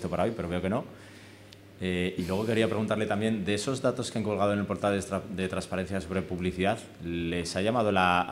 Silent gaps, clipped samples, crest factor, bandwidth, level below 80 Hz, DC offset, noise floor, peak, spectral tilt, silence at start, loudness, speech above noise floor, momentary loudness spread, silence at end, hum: none; under 0.1%; 20 dB; 15.5 kHz; -58 dBFS; under 0.1%; -51 dBFS; -10 dBFS; -5.5 dB/octave; 0 s; -29 LUFS; 22 dB; 8 LU; 0 s; none